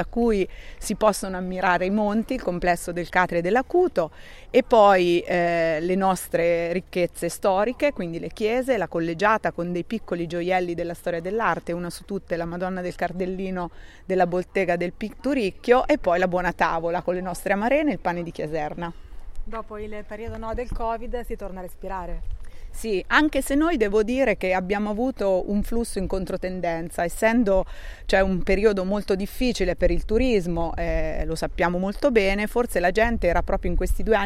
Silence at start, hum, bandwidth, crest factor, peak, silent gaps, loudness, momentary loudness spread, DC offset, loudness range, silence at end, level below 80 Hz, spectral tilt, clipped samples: 0 s; none; 15.5 kHz; 20 dB; -4 dBFS; none; -24 LUFS; 11 LU; under 0.1%; 7 LU; 0 s; -34 dBFS; -5.5 dB/octave; under 0.1%